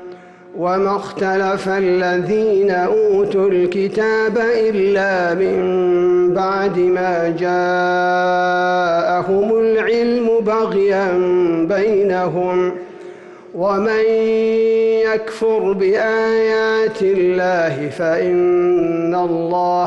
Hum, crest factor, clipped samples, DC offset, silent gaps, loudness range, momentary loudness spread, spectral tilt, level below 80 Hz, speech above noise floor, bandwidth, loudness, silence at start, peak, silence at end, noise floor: none; 8 dB; under 0.1%; under 0.1%; none; 2 LU; 4 LU; -6.5 dB/octave; -54 dBFS; 21 dB; 8.6 kHz; -16 LUFS; 0 s; -8 dBFS; 0 s; -37 dBFS